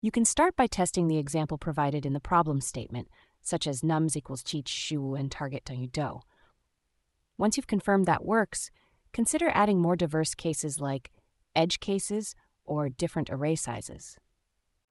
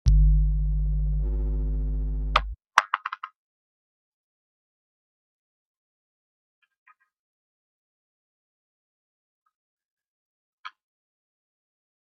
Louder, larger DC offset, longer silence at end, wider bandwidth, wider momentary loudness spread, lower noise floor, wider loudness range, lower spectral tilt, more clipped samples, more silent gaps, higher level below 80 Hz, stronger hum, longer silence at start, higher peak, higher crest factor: second, -29 LUFS vs -26 LUFS; neither; second, 0.75 s vs 1.3 s; first, 12 kHz vs 6.8 kHz; second, 13 LU vs 21 LU; second, -78 dBFS vs under -90 dBFS; second, 6 LU vs 13 LU; about the same, -4.5 dB/octave vs -5.5 dB/octave; neither; second, none vs 3.36-6.62 s, 6.78-6.86 s, 7.19-9.46 s, 9.55-9.77 s, 9.85-9.97 s, 10.08-10.64 s; second, -54 dBFS vs -30 dBFS; neither; about the same, 0.05 s vs 0.05 s; second, -10 dBFS vs 0 dBFS; second, 20 dB vs 28 dB